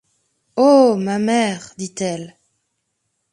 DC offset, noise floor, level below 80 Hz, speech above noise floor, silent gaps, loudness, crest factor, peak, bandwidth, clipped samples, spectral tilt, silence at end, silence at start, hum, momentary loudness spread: under 0.1%; -72 dBFS; -66 dBFS; 56 dB; none; -17 LUFS; 18 dB; 0 dBFS; 11 kHz; under 0.1%; -5 dB/octave; 1.05 s; 0.55 s; none; 18 LU